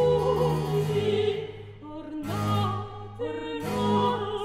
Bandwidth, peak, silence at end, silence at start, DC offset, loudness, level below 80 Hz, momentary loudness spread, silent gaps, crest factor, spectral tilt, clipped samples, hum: 15.5 kHz; -12 dBFS; 0 s; 0 s; under 0.1%; -27 LUFS; -50 dBFS; 15 LU; none; 14 dB; -7 dB/octave; under 0.1%; none